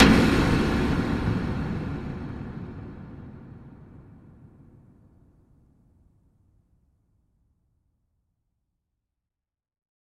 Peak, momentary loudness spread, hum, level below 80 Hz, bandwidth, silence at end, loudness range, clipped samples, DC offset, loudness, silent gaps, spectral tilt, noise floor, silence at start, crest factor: -2 dBFS; 25 LU; none; -38 dBFS; 15 kHz; 6 s; 25 LU; under 0.1%; under 0.1%; -25 LUFS; none; -6.5 dB/octave; -87 dBFS; 0 s; 28 dB